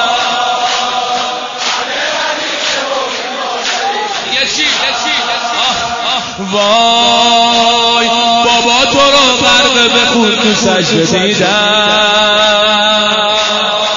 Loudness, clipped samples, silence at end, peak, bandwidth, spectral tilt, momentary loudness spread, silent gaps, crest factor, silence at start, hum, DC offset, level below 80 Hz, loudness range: -9 LUFS; under 0.1%; 0 s; 0 dBFS; 7.6 kHz; -2 dB/octave; 8 LU; none; 10 dB; 0 s; none; under 0.1%; -44 dBFS; 6 LU